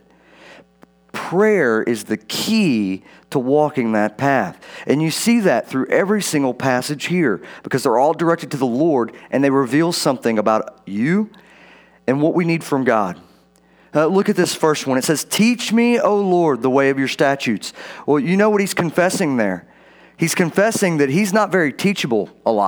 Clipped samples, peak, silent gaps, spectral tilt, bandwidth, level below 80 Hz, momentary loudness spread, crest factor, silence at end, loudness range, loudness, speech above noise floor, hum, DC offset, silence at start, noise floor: under 0.1%; -2 dBFS; none; -5 dB/octave; over 20 kHz; -66 dBFS; 7 LU; 16 dB; 0 s; 3 LU; -18 LUFS; 35 dB; none; under 0.1%; 0.5 s; -53 dBFS